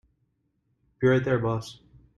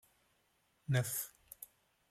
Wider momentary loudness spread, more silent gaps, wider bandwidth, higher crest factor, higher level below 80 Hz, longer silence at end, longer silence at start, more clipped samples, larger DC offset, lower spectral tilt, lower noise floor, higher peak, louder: second, 12 LU vs 18 LU; neither; second, 11.5 kHz vs 16 kHz; about the same, 18 dB vs 22 dB; first, -56 dBFS vs -74 dBFS; about the same, 0.45 s vs 0.45 s; about the same, 1 s vs 0.9 s; neither; neither; first, -7.5 dB/octave vs -4.5 dB/octave; second, -73 dBFS vs -77 dBFS; first, -10 dBFS vs -20 dBFS; first, -25 LUFS vs -38 LUFS